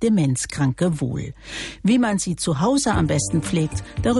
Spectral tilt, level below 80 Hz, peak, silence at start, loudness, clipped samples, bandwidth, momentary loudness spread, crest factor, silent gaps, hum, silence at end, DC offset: -5.5 dB/octave; -40 dBFS; -8 dBFS; 0 s; -21 LUFS; under 0.1%; 11.5 kHz; 9 LU; 12 dB; none; none; 0 s; under 0.1%